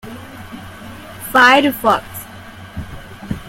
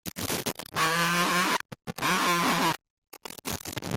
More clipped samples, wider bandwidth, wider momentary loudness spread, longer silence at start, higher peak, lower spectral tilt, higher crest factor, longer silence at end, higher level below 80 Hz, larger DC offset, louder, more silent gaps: neither; about the same, 16.5 kHz vs 17 kHz; first, 24 LU vs 14 LU; about the same, 0.05 s vs 0.05 s; first, 0 dBFS vs -12 dBFS; about the same, -4 dB/octave vs -3 dB/octave; about the same, 18 dB vs 16 dB; about the same, 0 s vs 0 s; first, -42 dBFS vs -60 dBFS; neither; first, -12 LUFS vs -27 LUFS; second, none vs 2.90-3.02 s